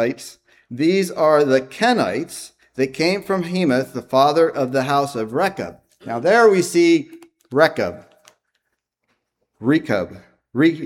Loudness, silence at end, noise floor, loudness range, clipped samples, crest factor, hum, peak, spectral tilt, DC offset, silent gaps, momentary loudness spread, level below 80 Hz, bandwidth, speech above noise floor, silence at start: -18 LUFS; 0 s; -75 dBFS; 5 LU; under 0.1%; 18 dB; none; 0 dBFS; -5.5 dB/octave; under 0.1%; none; 17 LU; -62 dBFS; 16 kHz; 58 dB; 0 s